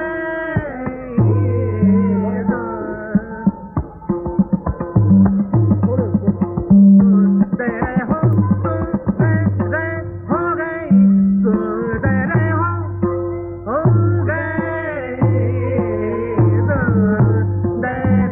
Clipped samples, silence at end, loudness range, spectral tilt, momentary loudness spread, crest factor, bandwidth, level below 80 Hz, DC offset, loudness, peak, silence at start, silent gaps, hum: under 0.1%; 0 s; 5 LU; -13.5 dB/octave; 10 LU; 14 dB; 3 kHz; -36 dBFS; under 0.1%; -17 LUFS; -2 dBFS; 0 s; none; none